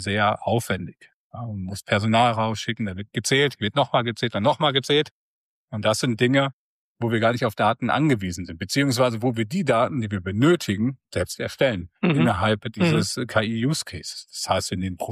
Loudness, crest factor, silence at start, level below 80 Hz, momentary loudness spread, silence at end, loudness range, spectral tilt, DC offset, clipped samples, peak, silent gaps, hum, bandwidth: -23 LUFS; 16 dB; 0 s; -56 dBFS; 11 LU; 0 s; 1 LU; -5 dB/octave; under 0.1%; under 0.1%; -8 dBFS; 1.14-1.30 s, 5.11-5.68 s, 6.53-6.95 s; none; 15 kHz